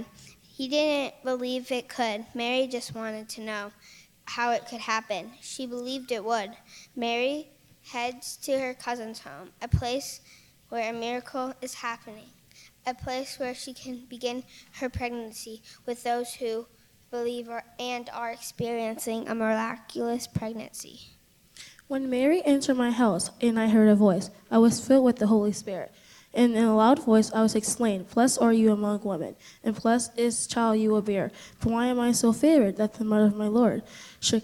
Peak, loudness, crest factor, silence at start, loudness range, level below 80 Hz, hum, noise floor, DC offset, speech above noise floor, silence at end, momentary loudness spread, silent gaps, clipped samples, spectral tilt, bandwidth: -10 dBFS; -27 LUFS; 18 dB; 0 s; 11 LU; -56 dBFS; none; -56 dBFS; under 0.1%; 29 dB; 0 s; 17 LU; none; under 0.1%; -4.5 dB/octave; 16 kHz